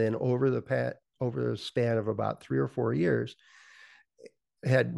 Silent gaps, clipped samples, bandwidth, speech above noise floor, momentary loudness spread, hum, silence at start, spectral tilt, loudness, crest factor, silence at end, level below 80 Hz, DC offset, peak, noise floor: none; under 0.1%; 11.5 kHz; 28 dB; 8 LU; none; 0 s; -8 dB/octave; -30 LUFS; 20 dB; 0 s; -68 dBFS; under 0.1%; -10 dBFS; -57 dBFS